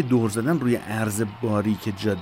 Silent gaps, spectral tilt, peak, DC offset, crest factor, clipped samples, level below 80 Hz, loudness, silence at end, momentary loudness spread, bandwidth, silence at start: none; -6 dB/octave; -8 dBFS; under 0.1%; 14 dB; under 0.1%; -58 dBFS; -24 LUFS; 0 s; 4 LU; 16 kHz; 0 s